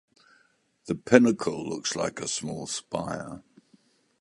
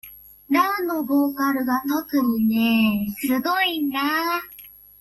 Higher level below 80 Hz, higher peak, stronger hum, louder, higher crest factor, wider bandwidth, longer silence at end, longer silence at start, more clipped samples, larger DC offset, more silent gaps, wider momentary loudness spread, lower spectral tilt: about the same, -62 dBFS vs -58 dBFS; first, -2 dBFS vs -6 dBFS; second, none vs 50 Hz at -60 dBFS; second, -27 LUFS vs -22 LUFS; first, 26 dB vs 16 dB; second, 11.5 kHz vs 16 kHz; first, 0.8 s vs 0.35 s; first, 0.85 s vs 0.05 s; neither; neither; neither; first, 16 LU vs 6 LU; about the same, -4 dB/octave vs -4 dB/octave